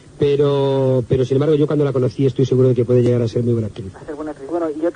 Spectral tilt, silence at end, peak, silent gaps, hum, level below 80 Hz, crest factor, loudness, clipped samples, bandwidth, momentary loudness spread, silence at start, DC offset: -8.5 dB/octave; 0.05 s; -4 dBFS; none; none; -50 dBFS; 14 dB; -17 LUFS; under 0.1%; 9.8 kHz; 13 LU; 0.15 s; under 0.1%